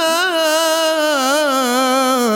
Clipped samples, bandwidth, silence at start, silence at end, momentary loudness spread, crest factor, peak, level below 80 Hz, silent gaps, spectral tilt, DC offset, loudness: under 0.1%; 17 kHz; 0 s; 0 s; 1 LU; 10 dB; -4 dBFS; -70 dBFS; none; -1 dB/octave; under 0.1%; -15 LUFS